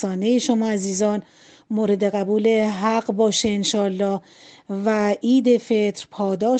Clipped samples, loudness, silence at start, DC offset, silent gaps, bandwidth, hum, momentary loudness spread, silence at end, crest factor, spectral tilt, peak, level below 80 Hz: under 0.1%; -21 LUFS; 0 s; under 0.1%; none; 9 kHz; none; 7 LU; 0 s; 14 dB; -5 dB/octave; -6 dBFS; -62 dBFS